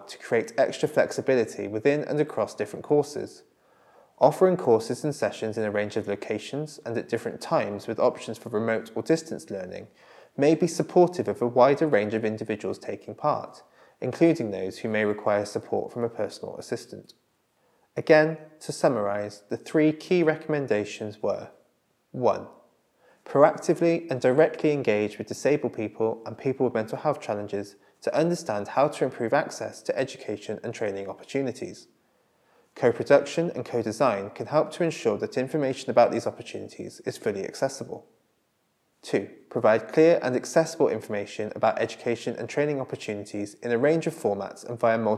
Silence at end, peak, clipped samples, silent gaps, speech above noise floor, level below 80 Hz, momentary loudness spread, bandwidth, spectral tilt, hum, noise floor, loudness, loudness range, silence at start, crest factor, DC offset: 0 s; -4 dBFS; under 0.1%; none; 46 dB; -78 dBFS; 14 LU; 13.5 kHz; -6 dB/octave; none; -71 dBFS; -26 LUFS; 5 LU; 0 s; 22 dB; under 0.1%